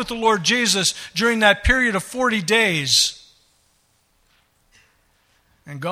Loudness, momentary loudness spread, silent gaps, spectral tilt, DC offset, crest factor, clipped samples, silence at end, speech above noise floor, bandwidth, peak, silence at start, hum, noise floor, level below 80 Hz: -17 LUFS; 6 LU; none; -2.5 dB/octave; under 0.1%; 22 dB; under 0.1%; 0 s; 44 dB; 16 kHz; 0 dBFS; 0 s; none; -63 dBFS; -36 dBFS